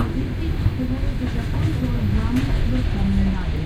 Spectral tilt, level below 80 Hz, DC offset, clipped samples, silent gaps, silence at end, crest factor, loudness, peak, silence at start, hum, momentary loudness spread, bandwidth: -7.5 dB/octave; -24 dBFS; under 0.1%; under 0.1%; none; 0 s; 14 dB; -23 LUFS; -6 dBFS; 0 s; none; 4 LU; 14.5 kHz